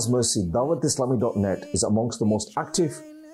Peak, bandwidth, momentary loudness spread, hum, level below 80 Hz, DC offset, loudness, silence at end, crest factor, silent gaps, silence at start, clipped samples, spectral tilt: -12 dBFS; 13 kHz; 4 LU; none; -54 dBFS; under 0.1%; -24 LUFS; 0 s; 12 dB; none; 0 s; under 0.1%; -5 dB/octave